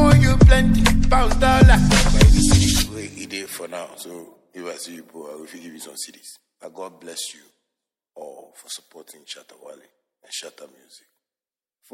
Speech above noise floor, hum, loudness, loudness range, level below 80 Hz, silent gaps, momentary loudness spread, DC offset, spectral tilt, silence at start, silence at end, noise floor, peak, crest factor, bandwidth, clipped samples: over 52 dB; none; -16 LUFS; 22 LU; -22 dBFS; none; 25 LU; under 0.1%; -5 dB/octave; 0 s; 1.45 s; under -90 dBFS; 0 dBFS; 18 dB; 15.5 kHz; under 0.1%